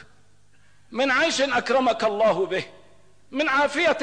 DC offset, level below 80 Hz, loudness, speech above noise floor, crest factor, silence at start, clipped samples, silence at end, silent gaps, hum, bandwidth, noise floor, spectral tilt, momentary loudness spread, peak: 0.3%; -62 dBFS; -22 LUFS; 38 dB; 12 dB; 0.9 s; under 0.1%; 0 s; none; 50 Hz at -65 dBFS; 10 kHz; -60 dBFS; -3 dB/octave; 11 LU; -12 dBFS